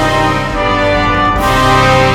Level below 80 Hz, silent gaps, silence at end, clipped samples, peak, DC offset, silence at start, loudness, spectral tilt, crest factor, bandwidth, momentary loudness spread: -24 dBFS; none; 0 s; under 0.1%; 0 dBFS; under 0.1%; 0 s; -11 LUFS; -5 dB/octave; 10 dB; 19 kHz; 5 LU